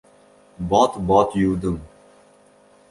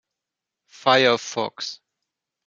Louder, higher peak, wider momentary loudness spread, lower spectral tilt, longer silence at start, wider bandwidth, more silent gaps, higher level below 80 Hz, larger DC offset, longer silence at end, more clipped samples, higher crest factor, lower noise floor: about the same, -20 LUFS vs -20 LUFS; about the same, -2 dBFS vs -4 dBFS; about the same, 13 LU vs 15 LU; first, -6.5 dB/octave vs -3 dB/octave; second, 0.6 s vs 0.85 s; first, 11.5 kHz vs 7.6 kHz; neither; first, -44 dBFS vs -74 dBFS; neither; first, 1.05 s vs 0.7 s; neither; about the same, 20 dB vs 22 dB; second, -53 dBFS vs -86 dBFS